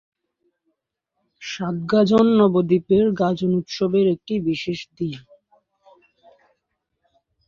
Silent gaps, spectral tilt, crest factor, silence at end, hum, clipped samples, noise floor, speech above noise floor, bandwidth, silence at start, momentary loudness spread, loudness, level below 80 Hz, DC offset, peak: none; -7.5 dB/octave; 18 dB; 2.3 s; none; under 0.1%; -78 dBFS; 59 dB; 7.2 kHz; 1.4 s; 14 LU; -20 LUFS; -58 dBFS; under 0.1%; -4 dBFS